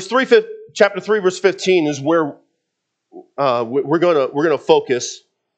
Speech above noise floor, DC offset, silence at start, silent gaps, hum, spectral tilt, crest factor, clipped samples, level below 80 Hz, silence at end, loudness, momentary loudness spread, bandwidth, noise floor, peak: 60 dB; under 0.1%; 0 s; none; none; -4.5 dB/octave; 18 dB; under 0.1%; -74 dBFS; 0.4 s; -17 LUFS; 10 LU; 8.8 kHz; -76 dBFS; 0 dBFS